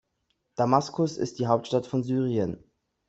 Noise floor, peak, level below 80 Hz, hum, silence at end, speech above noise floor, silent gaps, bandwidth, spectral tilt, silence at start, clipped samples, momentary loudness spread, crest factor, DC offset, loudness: -76 dBFS; -6 dBFS; -64 dBFS; none; 0.5 s; 50 dB; none; 8.2 kHz; -7 dB/octave; 0.6 s; under 0.1%; 8 LU; 20 dB; under 0.1%; -27 LUFS